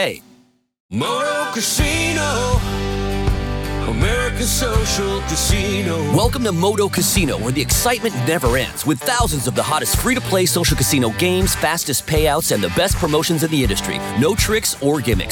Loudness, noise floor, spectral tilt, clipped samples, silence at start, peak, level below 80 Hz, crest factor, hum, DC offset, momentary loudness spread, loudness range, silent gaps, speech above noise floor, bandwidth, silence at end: -18 LUFS; -53 dBFS; -4 dB/octave; under 0.1%; 0 s; -4 dBFS; -28 dBFS; 14 dB; none; under 0.1%; 5 LU; 3 LU; 0.80-0.89 s; 35 dB; over 20 kHz; 0 s